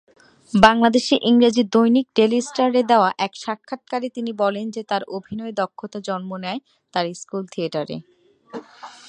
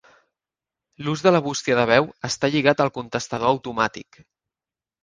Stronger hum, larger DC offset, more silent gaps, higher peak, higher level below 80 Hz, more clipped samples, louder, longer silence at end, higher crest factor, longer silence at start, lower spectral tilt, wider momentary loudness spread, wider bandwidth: neither; neither; neither; about the same, 0 dBFS vs 0 dBFS; about the same, -54 dBFS vs -58 dBFS; neither; about the same, -20 LUFS vs -21 LUFS; second, 0.2 s vs 1 s; about the same, 20 dB vs 22 dB; second, 0.55 s vs 1 s; about the same, -5 dB/octave vs -4.5 dB/octave; first, 16 LU vs 10 LU; about the same, 10 kHz vs 10 kHz